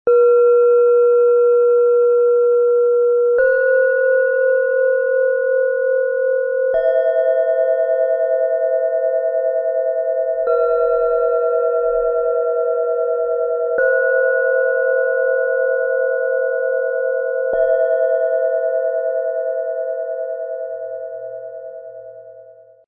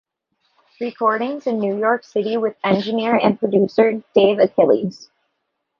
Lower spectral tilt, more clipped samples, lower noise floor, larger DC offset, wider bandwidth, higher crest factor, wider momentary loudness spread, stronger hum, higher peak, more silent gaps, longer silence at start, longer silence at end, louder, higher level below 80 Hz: about the same, -6.5 dB/octave vs -7 dB/octave; neither; second, -43 dBFS vs -74 dBFS; neither; second, 3.2 kHz vs 6.8 kHz; second, 10 dB vs 16 dB; first, 10 LU vs 7 LU; neither; second, -6 dBFS vs -2 dBFS; neither; second, 0.05 s vs 0.8 s; second, 0.35 s vs 0.75 s; about the same, -16 LUFS vs -18 LUFS; first, -56 dBFS vs -62 dBFS